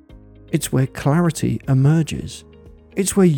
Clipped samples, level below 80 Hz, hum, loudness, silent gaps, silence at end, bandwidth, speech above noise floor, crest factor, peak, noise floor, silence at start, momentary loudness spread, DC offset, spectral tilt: under 0.1%; -44 dBFS; none; -19 LUFS; none; 0 s; 19 kHz; 26 dB; 16 dB; -4 dBFS; -44 dBFS; 0.1 s; 14 LU; under 0.1%; -6.5 dB/octave